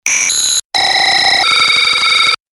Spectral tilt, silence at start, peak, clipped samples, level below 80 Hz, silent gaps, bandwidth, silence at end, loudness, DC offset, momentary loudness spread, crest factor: 2 dB/octave; 0.05 s; 0 dBFS; under 0.1%; -50 dBFS; 0.65-0.70 s; 19.5 kHz; 0.2 s; -9 LUFS; under 0.1%; 3 LU; 12 dB